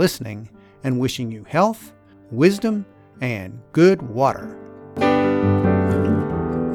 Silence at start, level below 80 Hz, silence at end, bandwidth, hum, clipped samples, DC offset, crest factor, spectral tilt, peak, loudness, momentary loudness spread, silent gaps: 0 s; -48 dBFS; 0 s; 18 kHz; none; under 0.1%; under 0.1%; 18 dB; -7 dB/octave; -2 dBFS; -20 LUFS; 17 LU; none